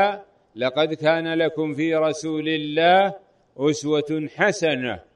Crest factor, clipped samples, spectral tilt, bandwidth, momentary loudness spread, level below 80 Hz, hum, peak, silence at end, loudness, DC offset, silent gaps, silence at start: 16 dB; under 0.1%; -5 dB/octave; 10.5 kHz; 8 LU; -66 dBFS; none; -6 dBFS; 0.15 s; -22 LUFS; under 0.1%; none; 0 s